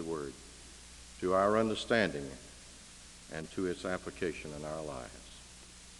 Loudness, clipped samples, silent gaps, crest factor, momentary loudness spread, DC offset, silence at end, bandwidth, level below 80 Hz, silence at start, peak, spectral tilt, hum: -35 LUFS; under 0.1%; none; 22 dB; 21 LU; under 0.1%; 0 s; 12 kHz; -58 dBFS; 0 s; -14 dBFS; -4.5 dB/octave; 60 Hz at -60 dBFS